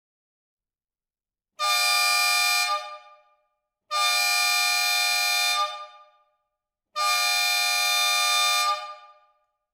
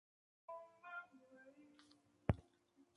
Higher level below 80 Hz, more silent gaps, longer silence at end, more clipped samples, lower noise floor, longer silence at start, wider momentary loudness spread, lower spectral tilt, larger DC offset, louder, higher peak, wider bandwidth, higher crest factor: second, -86 dBFS vs -60 dBFS; neither; first, 0.7 s vs 0.55 s; neither; first, under -90 dBFS vs -75 dBFS; first, 1.6 s vs 0.5 s; second, 11 LU vs 23 LU; second, 6 dB/octave vs -8.5 dB/octave; neither; first, -21 LUFS vs -49 LUFS; first, -6 dBFS vs -20 dBFS; first, 17 kHz vs 11 kHz; second, 18 dB vs 30 dB